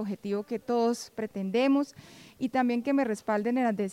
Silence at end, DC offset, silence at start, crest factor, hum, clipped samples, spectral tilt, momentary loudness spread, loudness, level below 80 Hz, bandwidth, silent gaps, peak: 0 s; under 0.1%; 0 s; 14 dB; none; under 0.1%; -6 dB/octave; 8 LU; -29 LUFS; -72 dBFS; 15.5 kHz; none; -16 dBFS